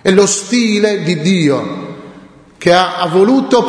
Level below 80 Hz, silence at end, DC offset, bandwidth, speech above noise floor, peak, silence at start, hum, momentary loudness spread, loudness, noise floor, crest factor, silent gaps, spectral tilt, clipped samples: -52 dBFS; 0 s; under 0.1%; 10.5 kHz; 27 dB; 0 dBFS; 0.05 s; none; 14 LU; -12 LUFS; -39 dBFS; 12 dB; none; -4.5 dB/octave; under 0.1%